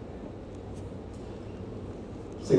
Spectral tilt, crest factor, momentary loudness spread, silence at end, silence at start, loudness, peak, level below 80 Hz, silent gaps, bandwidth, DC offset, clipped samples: -7.5 dB/octave; 24 dB; 2 LU; 0 s; 0 s; -41 LUFS; -8 dBFS; -50 dBFS; none; 10.5 kHz; under 0.1%; under 0.1%